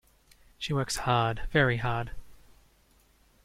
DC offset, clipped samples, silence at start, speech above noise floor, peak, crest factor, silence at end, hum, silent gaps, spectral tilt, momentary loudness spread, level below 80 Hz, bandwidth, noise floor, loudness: under 0.1%; under 0.1%; 0.6 s; 36 dB; -10 dBFS; 20 dB; 1.1 s; none; none; -5 dB/octave; 11 LU; -46 dBFS; 16 kHz; -63 dBFS; -28 LUFS